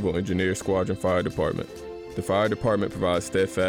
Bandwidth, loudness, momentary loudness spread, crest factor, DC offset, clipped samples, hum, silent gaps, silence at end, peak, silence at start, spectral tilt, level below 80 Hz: 18 kHz; -26 LUFS; 9 LU; 12 dB; under 0.1%; under 0.1%; none; none; 0 s; -14 dBFS; 0 s; -5.5 dB/octave; -50 dBFS